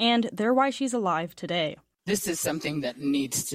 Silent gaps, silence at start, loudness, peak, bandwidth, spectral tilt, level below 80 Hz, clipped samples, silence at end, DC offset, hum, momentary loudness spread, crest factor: none; 0 s; -27 LUFS; -10 dBFS; 16 kHz; -3.5 dB/octave; -64 dBFS; under 0.1%; 0 s; under 0.1%; none; 7 LU; 16 dB